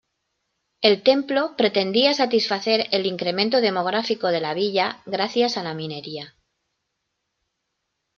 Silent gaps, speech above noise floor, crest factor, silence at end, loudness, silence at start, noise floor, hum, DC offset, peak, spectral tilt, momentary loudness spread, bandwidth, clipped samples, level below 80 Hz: none; 56 dB; 20 dB; 1.9 s; -21 LUFS; 0.8 s; -78 dBFS; none; under 0.1%; -2 dBFS; -4.5 dB/octave; 12 LU; 7.4 kHz; under 0.1%; -72 dBFS